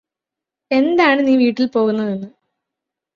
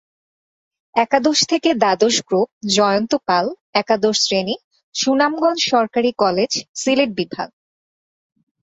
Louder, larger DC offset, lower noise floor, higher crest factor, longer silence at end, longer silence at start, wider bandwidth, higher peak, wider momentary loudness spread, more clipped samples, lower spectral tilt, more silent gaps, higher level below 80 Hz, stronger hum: about the same, -16 LUFS vs -17 LUFS; neither; second, -86 dBFS vs under -90 dBFS; about the same, 18 dB vs 18 dB; second, 0.85 s vs 1.15 s; second, 0.7 s vs 0.95 s; second, 7 kHz vs 8.2 kHz; about the same, 0 dBFS vs -2 dBFS; first, 11 LU vs 8 LU; neither; first, -6.5 dB/octave vs -3 dB/octave; second, none vs 2.52-2.61 s, 3.61-3.73 s, 4.64-4.71 s, 4.83-4.93 s, 6.69-6.74 s; about the same, -64 dBFS vs -62 dBFS; neither